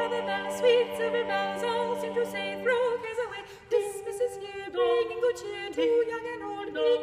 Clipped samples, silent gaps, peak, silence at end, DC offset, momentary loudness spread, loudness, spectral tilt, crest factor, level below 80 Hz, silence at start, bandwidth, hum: under 0.1%; none; -12 dBFS; 0 s; under 0.1%; 9 LU; -29 LUFS; -3.5 dB/octave; 16 dB; -66 dBFS; 0 s; 15 kHz; none